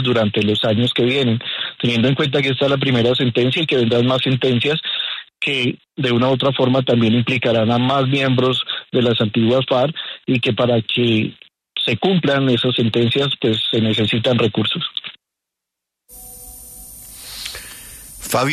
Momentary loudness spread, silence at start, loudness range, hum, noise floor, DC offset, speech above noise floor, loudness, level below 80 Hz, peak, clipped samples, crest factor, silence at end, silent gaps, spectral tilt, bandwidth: 13 LU; 0 s; 6 LU; none; -82 dBFS; under 0.1%; 66 dB; -17 LUFS; -52 dBFS; -4 dBFS; under 0.1%; 14 dB; 0 s; none; -6 dB/octave; 13.5 kHz